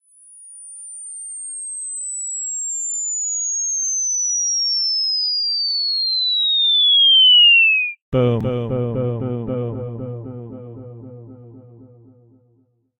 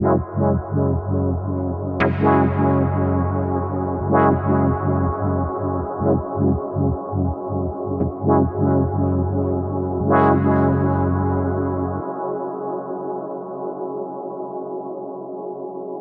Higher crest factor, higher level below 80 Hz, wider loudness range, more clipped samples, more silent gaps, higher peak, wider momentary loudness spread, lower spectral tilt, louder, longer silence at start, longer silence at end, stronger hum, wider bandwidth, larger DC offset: about the same, 14 dB vs 18 dB; second, -52 dBFS vs -40 dBFS; first, 16 LU vs 8 LU; neither; first, 8.02-8.12 s vs none; second, -6 dBFS vs -2 dBFS; first, 23 LU vs 12 LU; second, -1.5 dB/octave vs -12 dB/octave; first, -15 LUFS vs -21 LUFS; first, 0.35 s vs 0 s; first, 1.15 s vs 0 s; neither; first, 10.5 kHz vs 4 kHz; neither